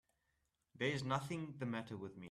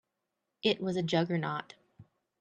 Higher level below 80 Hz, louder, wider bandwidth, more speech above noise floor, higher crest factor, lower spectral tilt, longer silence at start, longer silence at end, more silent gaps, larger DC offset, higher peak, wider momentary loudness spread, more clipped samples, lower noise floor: about the same, -76 dBFS vs -74 dBFS; second, -43 LUFS vs -32 LUFS; first, 13.5 kHz vs 9.2 kHz; second, 42 dB vs 54 dB; about the same, 20 dB vs 20 dB; about the same, -5.5 dB/octave vs -6 dB/octave; about the same, 0.75 s vs 0.65 s; second, 0 s vs 0.4 s; neither; neither; second, -24 dBFS vs -14 dBFS; first, 9 LU vs 6 LU; neither; about the same, -85 dBFS vs -85 dBFS